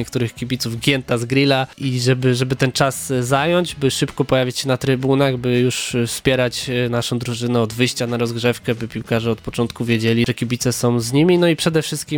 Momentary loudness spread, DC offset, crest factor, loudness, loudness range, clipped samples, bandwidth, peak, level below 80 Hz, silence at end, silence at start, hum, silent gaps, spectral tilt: 6 LU; under 0.1%; 18 dB; -18 LUFS; 2 LU; under 0.1%; 18.5 kHz; 0 dBFS; -46 dBFS; 0 s; 0 s; none; none; -5 dB/octave